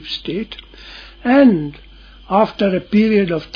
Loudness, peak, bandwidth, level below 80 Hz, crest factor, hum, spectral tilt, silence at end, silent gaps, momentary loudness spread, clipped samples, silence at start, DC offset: -16 LUFS; 0 dBFS; 5.4 kHz; -44 dBFS; 16 dB; none; -8 dB/octave; 0.1 s; none; 23 LU; under 0.1%; 0 s; under 0.1%